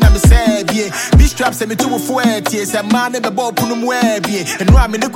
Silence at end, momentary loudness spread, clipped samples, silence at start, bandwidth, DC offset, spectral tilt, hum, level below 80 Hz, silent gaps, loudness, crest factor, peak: 0 s; 7 LU; under 0.1%; 0 s; 17 kHz; under 0.1%; -5 dB/octave; none; -16 dBFS; none; -14 LUFS; 12 dB; 0 dBFS